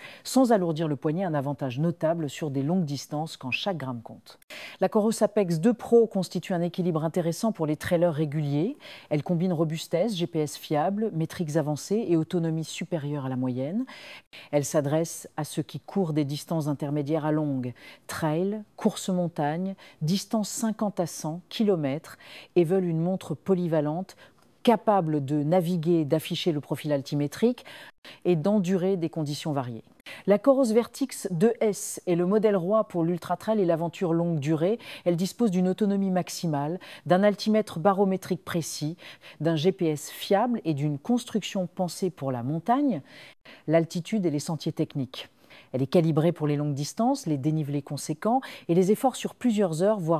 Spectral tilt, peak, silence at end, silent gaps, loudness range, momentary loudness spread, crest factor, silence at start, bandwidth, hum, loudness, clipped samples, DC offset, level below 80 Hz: -6.5 dB/octave; -8 dBFS; 0 s; 4.43-4.48 s, 14.27-14.31 s, 27.98-28.02 s; 4 LU; 10 LU; 18 dB; 0 s; 15.5 kHz; none; -27 LUFS; under 0.1%; under 0.1%; -70 dBFS